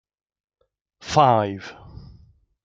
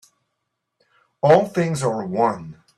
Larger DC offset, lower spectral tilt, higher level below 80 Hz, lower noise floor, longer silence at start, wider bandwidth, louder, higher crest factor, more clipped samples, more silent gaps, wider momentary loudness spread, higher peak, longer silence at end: neither; about the same, -5.5 dB/octave vs -6.5 dB/octave; first, -54 dBFS vs -62 dBFS; second, -54 dBFS vs -77 dBFS; second, 1.05 s vs 1.25 s; second, 9 kHz vs 13 kHz; about the same, -19 LUFS vs -19 LUFS; about the same, 22 dB vs 20 dB; neither; neither; first, 23 LU vs 7 LU; about the same, -2 dBFS vs -2 dBFS; first, 0.9 s vs 0.25 s